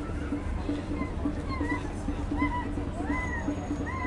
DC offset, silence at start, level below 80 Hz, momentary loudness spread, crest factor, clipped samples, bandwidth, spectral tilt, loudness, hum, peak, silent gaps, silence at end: under 0.1%; 0 s; -38 dBFS; 4 LU; 16 dB; under 0.1%; 11.5 kHz; -7 dB/octave; -32 LUFS; none; -16 dBFS; none; 0 s